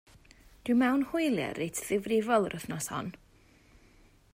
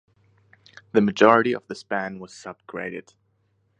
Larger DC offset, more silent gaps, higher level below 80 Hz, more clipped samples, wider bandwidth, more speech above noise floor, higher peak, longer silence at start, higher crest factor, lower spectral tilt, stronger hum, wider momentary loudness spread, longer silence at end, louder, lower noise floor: neither; neither; about the same, -62 dBFS vs -66 dBFS; neither; first, 16 kHz vs 9.6 kHz; second, 31 dB vs 45 dB; second, -14 dBFS vs 0 dBFS; second, 0.65 s vs 0.95 s; second, 18 dB vs 24 dB; about the same, -5 dB/octave vs -6 dB/octave; neither; second, 10 LU vs 22 LU; first, 1.2 s vs 0.8 s; second, -30 LUFS vs -22 LUFS; second, -61 dBFS vs -68 dBFS